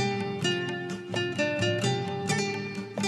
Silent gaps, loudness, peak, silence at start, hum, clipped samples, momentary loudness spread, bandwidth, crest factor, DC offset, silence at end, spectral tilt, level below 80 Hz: none; -29 LUFS; -14 dBFS; 0 s; none; under 0.1%; 7 LU; 13 kHz; 16 dB; under 0.1%; 0 s; -4.5 dB/octave; -64 dBFS